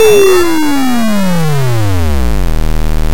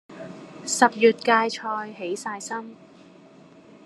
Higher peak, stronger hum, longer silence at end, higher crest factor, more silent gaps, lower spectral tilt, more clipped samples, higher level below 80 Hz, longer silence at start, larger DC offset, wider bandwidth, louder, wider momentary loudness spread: about the same, 0 dBFS vs 0 dBFS; neither; second, 0 s vs 1.1 s; second, 10 dB vs 24 dB; neither; first, -5.5 dB/octave vs -2.5 dB/octave; first, 1% vs under 0.1%; first, -18 dBFS vs -78 dBFS; about the same, 0 s vs 0.1 s; first, 30% vs under 0.1%; first, 17 kHz vs 13 kHz; first, -12 LUFS vs -23 LUFS; second, 9 LU vs 22 LU